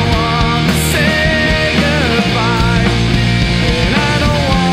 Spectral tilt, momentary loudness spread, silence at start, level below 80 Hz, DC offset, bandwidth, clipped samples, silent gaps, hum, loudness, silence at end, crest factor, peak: -5 dB/octave; 1 LU; 0 s; -22 dBFS; under 0.1%; 16 kHz; under 0.1%; none; none; -12 LUFS; 0 s; 12 dB; 0 dBFS